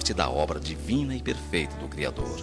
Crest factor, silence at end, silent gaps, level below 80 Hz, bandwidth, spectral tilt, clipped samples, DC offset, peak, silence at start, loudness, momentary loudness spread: 24 dB; 0 s; none; -38 dBFS; 12.5 kHz; -4.5 dB/octave; under 0.1%; 0.2%; -6 dBFS; 0 s; -29 LUFS; 6 LU